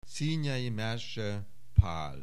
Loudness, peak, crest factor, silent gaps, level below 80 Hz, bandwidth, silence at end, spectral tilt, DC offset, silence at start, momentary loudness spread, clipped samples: -33 LUFS; -8 dBFS; 24 dB; none; -40 dBFS; 12.5 kHz; 0 s; -6 dB/octave; 1%; 0.1 s; 8 LU; under 0.1%